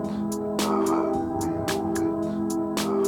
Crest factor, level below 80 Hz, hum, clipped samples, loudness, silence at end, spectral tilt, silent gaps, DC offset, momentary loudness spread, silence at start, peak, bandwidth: 14 dB; -52 dBFS; none; under 0.1%; -26 LUFS; 0 s; -5 dB/octave; none; under 0.1%; 4 LU; 0 s; -12 dBFS; 18 kHz